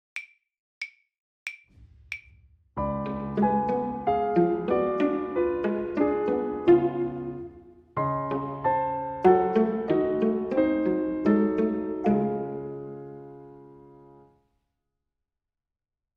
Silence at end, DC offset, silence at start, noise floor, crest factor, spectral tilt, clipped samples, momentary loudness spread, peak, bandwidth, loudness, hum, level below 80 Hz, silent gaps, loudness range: 2.25 s; under 0.1%; 0.15 s; -88 dBFS; 20 dB; -9 dB/octave; under 0.1%; 17 LU; -8 dBFS; 6 kHz; -26 LUFS; none; -54 dBFS; 0.59-0.81 s, 1.20-1.46 s; 9 LU